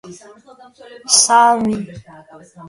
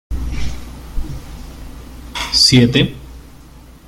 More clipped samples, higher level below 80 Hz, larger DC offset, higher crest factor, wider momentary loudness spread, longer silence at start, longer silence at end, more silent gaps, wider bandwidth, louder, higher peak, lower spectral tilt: neither; second, -56 dBFS vs -28 dBFS; neither; about the same, 18 dB vs 18 dB; second, 22 LU vs 26 LU; about the same, 0.05 s vs 0.1 s; second, 0 s vs 0.15 s; neither; second, 11.5 kHz vs 16 kHz; about the same, -13 LUFS vs -13 LUFS; about the same, 0 dBFS vs 0 dBFS; second, -1.5 dB/octave vs -4 dB/octave